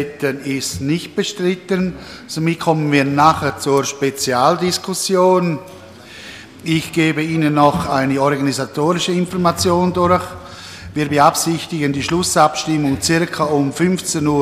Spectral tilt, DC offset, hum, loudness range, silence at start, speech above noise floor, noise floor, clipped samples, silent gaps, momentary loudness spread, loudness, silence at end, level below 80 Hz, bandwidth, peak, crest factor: -4.5 dB/octave; under 0.1%; none; 2 LU; 0 s; 20 dB; -36 dBFS; under 0.1%; none; 13 LU; -17 LUFS; 0 s; -46 dBFS; 15 kHz; 0 dBFS; 16 dB